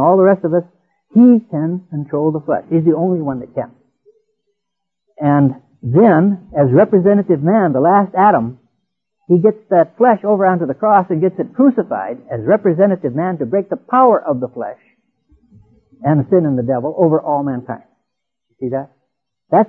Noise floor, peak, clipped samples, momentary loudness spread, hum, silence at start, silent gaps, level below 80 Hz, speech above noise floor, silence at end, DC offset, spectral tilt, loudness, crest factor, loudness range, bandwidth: -79 dBFS; 0 dBFS; under 0.1%; 13 LU; none; 0 s; none; -58 dBFS; 65 dB; 0 s; under 0.1%; -12.5 dB/octave; -14 LUFS; 14 dB; 6 LU; 3.4 kHz